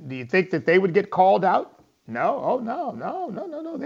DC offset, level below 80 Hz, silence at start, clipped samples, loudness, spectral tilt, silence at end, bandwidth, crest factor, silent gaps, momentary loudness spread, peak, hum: under 0.1%; -72 dBFS; 0 s; under 0.1%; -23 LUFS; -7.5 dB/octave; 0 s; 7.4 kHz; 16 dB; none; 14 LU; -6 dBFS; none